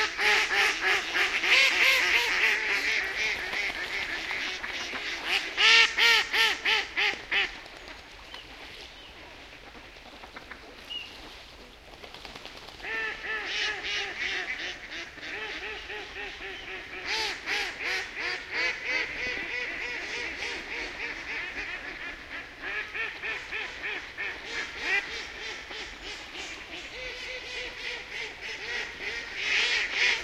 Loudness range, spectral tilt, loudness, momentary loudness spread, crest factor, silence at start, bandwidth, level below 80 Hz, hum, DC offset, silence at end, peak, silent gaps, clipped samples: 16 LU; 0 dB/octave; -27 LUFS; 22 LU; 24 dB; 0 s; 16 kHz; -56 dBFS; none; under 0.1%; 0 s; -6 dBFS; none; under 0.1%